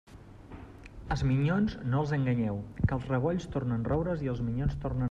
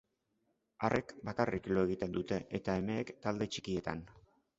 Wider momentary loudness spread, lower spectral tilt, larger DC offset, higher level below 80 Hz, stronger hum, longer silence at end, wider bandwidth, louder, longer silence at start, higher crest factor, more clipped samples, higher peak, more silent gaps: first, 20 LU vs 5 LU; first, -8.5 dB/octave vs -5.5 dB/octave; neither; first, -44 dBFS vs -60 dBFS; neither; second, 0 s vs 0.4 s; about the same, 7.8 kHz vs 8 kHz; first, -31 LUFS vs -37 LUFS; second, 0.1 s vs 0.8 s; second, 16 dB vs 22 dB; neither; about the same, -14 dBFS vs -14 dBFS; neither